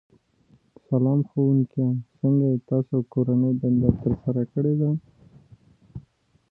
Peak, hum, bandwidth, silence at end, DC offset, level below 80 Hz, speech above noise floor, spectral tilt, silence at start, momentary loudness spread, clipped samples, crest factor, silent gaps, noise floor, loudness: -4 dBFS; none; 1.8 kHz; 0.5 s; under 0.1%; -48 dBFS; 38 dB; -14 dB/octave; 0.9 s; 7 LU; under 0.1%; 20 dB; none; -60 dBFS; -23 LUFS